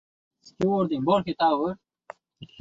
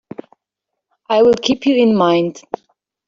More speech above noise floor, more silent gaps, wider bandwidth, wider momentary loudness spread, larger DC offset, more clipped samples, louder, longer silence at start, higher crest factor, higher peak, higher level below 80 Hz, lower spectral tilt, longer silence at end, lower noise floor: second, 25 dB vs 66 dB; neither; about the same, 7.8 kHz vs 7.6 kHz; second, 14 LU vs 19 LU; neither; neither; second, -25 LUFS vs -14 LUFS; second, 0.45 s vs 1.1 s; about the same, 18 dB vs 14 dB; second, -10 dBFS vs -2 dBFS; about the same, -62 dBFS vs -58 dBFS; first, -7.5 dB/octave vs -5.5 dB/octave; second, 0.15 s vs 0.7 s; second, -48 dBFS vs -80 dBFS